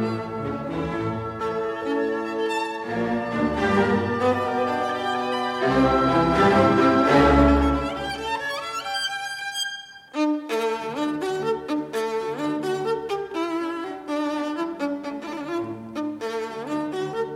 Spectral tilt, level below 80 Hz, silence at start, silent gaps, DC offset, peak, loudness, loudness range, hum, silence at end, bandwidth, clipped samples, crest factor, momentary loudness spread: -5.5 dB/octave; -38 dBFS; 0 s; none; under 0.1%; -4 dBFS; -24 LUFS; 9 LU; none; 0 s; 15.5 kHz; under 0.1%; 20 dB; 12 LU